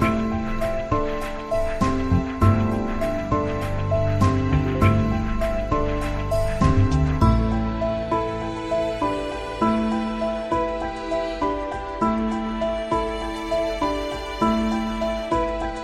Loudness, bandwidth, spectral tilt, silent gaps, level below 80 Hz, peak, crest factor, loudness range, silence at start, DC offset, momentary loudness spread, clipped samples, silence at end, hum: -23 LUFS; 13 kHz; -7.5 dB/octave; none; -30 dBFS; -4 dBFS; 18 dB; 3 LU; 0 s; under 0.1%; 7 LU; under 0.1%; 0 s; none